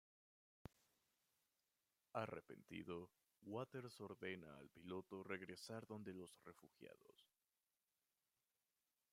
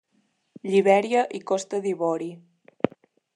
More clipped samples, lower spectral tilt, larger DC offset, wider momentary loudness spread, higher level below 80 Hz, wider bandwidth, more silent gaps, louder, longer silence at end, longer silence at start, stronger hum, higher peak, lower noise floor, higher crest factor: neither; about the same, -5.5 dB/octave vs -5.5 dB/octave; neither; about the same, 14 LU vs 12 LU; second, -86 dBFS vs -78 dBFS; first, 15.5 kHz vs 10.5 kHz; neither; second, -54 LUFS vs -24 LUFS; first, 1.85 s vs 0.5 s; first, 2.15 s vs 0.65 s; neither; second, -32 dBFS vs -4 dBFS; first, under -90 dBFS vs -69 dBFS; first, 26 dB vs 20 dB